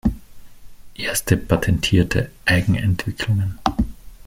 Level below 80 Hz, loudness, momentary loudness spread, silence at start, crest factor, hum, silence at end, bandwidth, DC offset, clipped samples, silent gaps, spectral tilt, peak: -34 dBFS; -20 LUFS; 8 LU; 0.05 s; 20 dB; none; 0 s; 16.5 kHz; under 0.1%; under 0.1%; none; -5 dB/octave; 0 dBFS